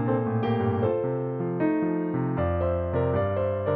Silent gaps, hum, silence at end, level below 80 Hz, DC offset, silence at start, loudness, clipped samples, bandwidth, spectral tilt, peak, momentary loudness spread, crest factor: none; none; 0 s; -46 dBFS; under 0.1%; 0 s; -26 LUFS; under 0.1%; 4.7 kHz; -8.5 dB/octave; -12 dBFS; 2 LU; 14 dB